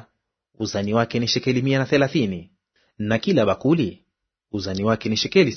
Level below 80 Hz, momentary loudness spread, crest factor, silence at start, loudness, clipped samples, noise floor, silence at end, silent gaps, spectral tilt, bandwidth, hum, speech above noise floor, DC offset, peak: -56 dBFS; 11 LU; 20 dB; 0.6 s; -22 LUFS; under 0.1%; -70 dBFS; 0 s; none; -5.5 dB/octave; 6.6 kHz; none; 49 dB; under 0.1%; -2 dBFS